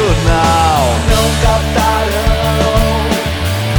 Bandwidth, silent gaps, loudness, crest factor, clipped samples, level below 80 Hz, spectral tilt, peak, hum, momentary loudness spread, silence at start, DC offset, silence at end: over 20 kHz; none; -12 LUFS; 12 dB; under 0.1%; -18 dBFS; -5 dB/octave; 0 dBFS; none; 4 LU; 0 s; under 0.1%; 0 s